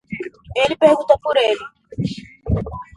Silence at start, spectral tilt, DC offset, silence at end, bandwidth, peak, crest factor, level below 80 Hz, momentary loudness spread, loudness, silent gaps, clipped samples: 0.1 s; -6 dB/octave; under 0.1%; 0.15 s; 11.5 kHz; 0 dBFS; 18 dB; -36 dBFS; 16 LU; -18 LUFS; none; under 0.1%